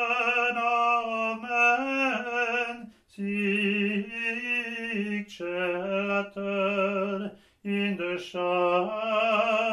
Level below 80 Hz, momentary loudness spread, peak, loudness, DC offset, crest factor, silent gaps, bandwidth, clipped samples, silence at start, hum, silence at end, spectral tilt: -70 dBFS; 9 LU; -12 dBFS; -27 LUFS; under 0.1%; 16 dB; none; 12 kHz; under 0.1%; 0 s; none; 0 s; -5.5 dB/octave